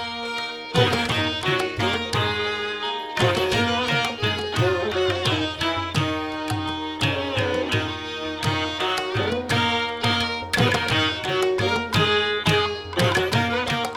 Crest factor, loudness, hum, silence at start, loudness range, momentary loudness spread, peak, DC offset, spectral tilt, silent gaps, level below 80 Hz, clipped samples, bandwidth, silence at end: 18 dB; -22 LUFS; none; 0 s; 3 LU; 6 LU; -6 dBFS; under 0.1%; -4.5 dB/octave; none; -48 dBFS; under 0.1%; 18.5 kHz; 0 s